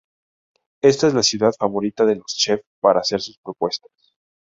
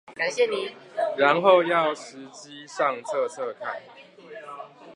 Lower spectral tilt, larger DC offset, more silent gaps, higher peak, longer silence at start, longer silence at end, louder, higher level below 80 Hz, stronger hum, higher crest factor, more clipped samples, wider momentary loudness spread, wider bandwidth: about the same, -3.5 dB/octave vs -4 dB/octave; neither; first, 2.67-2.82 s, 3.37-3.43 s vs none; about the same, -2 dBFS vs -4 dBFS; first, 0.85 s vs 0.1 s; first, 0.85 s vs 0 s; first, -19 LUFS vs -24 LUFS; first, -60 dBFS vs -84 dBFS; neither; about the same, 18 dB vs 22 dB; neither; second, 10 LU vs 23 LU; second, 7.8 kHz vs 11 kHz